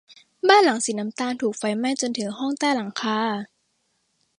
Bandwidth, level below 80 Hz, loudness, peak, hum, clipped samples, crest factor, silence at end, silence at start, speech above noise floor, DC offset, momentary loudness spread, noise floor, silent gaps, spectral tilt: 11.5 kHz; -74 dBFS; -23 LUFS; -2 dBFS; none; under 0.1%; 22 dB; 0.95 s; 0.45 s; 49 dB; under 0.1%; 11 LU; -71 dBFS; none; -3 dB/octave